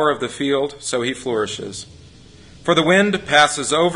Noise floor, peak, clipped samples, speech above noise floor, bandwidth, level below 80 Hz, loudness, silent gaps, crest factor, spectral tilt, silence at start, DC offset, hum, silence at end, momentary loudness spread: -44 dBFS; 0 dBFS; under 0.1%; 25 dB; 11 kHz; -52 dBFS; -18 LUFS; none; 18 dB; -3.5 dB/octave; 0 s; under 0.1%; none; 0 s; 13 LU